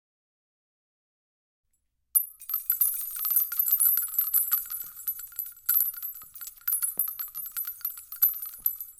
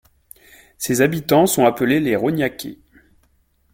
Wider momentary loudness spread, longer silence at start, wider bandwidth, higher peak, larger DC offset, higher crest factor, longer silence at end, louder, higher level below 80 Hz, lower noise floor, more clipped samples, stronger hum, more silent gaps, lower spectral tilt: about the same, 12 LU vs 13 LU; first, 2.15 s vs 0.8 s; about the same, 17 kHz vs 17 kHz; second, -8 dBFS vs -2 dBFS; neither; about the same, 22 dB vs 18 dB; second, 0.1 s vs 1 s; second, -26 LUFS vs -18 LUFS; second, -68 dBFS vs -54 dBFS; first, -75 dBFS vs -61 dBFS; neither; neither; neither; second, 2.5 dB/octave vs -5 dB/octave